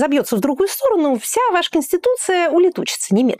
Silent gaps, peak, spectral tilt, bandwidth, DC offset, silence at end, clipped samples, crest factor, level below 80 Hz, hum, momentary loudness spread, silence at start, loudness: none; -6 dBFS; -4 dB/octave; 16 kHz; under 0.1%; 0 s; under 0.1%; 10 dB; -58 dBFS; none; 3 LU; 0 s; -17 LUFS